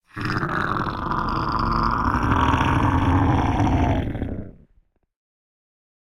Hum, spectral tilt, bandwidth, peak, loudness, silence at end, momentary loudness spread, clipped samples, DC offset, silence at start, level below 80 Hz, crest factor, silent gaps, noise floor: none; -7.5 dB/octave; 11.5 kHz; -6 dBFS; -22 LUFS; 1.6 s; 7 LU; under 0.1%; under 0.1%; 0.15 s; -32 dBFS; 16 dB; none; -61 dBFS